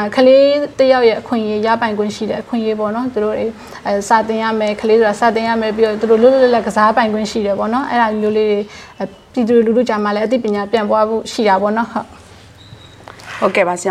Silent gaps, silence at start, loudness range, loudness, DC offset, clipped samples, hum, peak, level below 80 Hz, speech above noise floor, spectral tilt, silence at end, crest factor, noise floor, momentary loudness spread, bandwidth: none; 0 s; 4 LU; -14 LUFS; under 0.1%; under 0.1%; none; 0 dBFS; -50 dBFS; 26 dB; -5 dB/octave; 0 s; 14 dB; -40 dBFS; 11 LU; 12.5 kHz